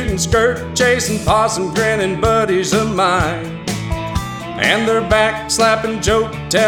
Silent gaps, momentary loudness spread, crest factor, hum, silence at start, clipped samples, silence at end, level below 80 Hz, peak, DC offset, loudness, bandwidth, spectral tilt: none; 8 LU; 16 dB; none; 0 s; under 0.1%; 0 s; -32 dBFS; 0 dBFS; under 0.1%; -16 LUFS; 18.5 kHz; -4 dB/octave